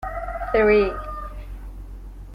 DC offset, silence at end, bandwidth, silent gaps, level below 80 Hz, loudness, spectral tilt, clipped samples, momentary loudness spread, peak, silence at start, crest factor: under 0.1%; 0 s; 5.4 kHz; none; -34 dBFS; -21 LUFS; -7.5 dB/octave; under 0.1%; 23 LU; -6 dBFS; 0 s; 18 dB